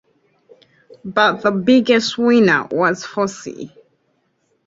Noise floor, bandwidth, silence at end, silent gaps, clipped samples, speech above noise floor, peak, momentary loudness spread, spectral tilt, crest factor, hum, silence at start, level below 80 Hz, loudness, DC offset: -65 dBFS; 7.8 kHz; 1 s; none; under 0.1%; 49 dB; -2 dBFS; 19 LU; -5 dB/octave; 16 dB; none; 1.05 s; -60 dBFS; -16 LUFS; under 0.1%